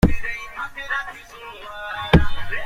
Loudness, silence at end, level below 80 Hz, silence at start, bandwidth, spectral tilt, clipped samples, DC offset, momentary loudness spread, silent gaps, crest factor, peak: -23 LUFS; 0 s; -28 dBFS; 0 s; 14.5 kHz; -6.5 dB/octave; under 0.1%; under 0.1%; 18 LU; none; 18 dB; -2 dBFS